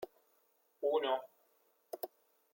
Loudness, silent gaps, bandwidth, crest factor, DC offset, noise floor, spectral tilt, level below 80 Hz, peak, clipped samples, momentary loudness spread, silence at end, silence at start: -38 LUFS; none; 16.5 kHz; 18 dB; under 0.1%; -75 dBFS; -3 dB/octave; under -90 dBFS; -22 dBFS; under 0.1%; 17 LU; 0.45 s; 0 s